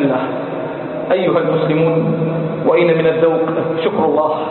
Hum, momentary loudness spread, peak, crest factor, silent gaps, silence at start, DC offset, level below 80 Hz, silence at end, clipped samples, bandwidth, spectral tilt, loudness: none; 9 LU; -2 dBFS; 14 dB; none; 0 s; under 0.1%; -56 dBFS; 0 s; under 0.1%; 4.3 kHz; -12.5 dB/octave; -16 LUFS